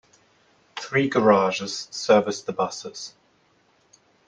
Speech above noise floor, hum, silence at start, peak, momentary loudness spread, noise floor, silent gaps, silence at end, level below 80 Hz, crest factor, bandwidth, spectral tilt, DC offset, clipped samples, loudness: 40 dB; none; 0.75 s; -4 dBFS; 19 LU; -63 dBFS; none; 1.2 s; -70 dBFS; 20 dB; 10 kHz; -4.5 dB/octave; under 0.1%; under 0.1%; -22 LUFS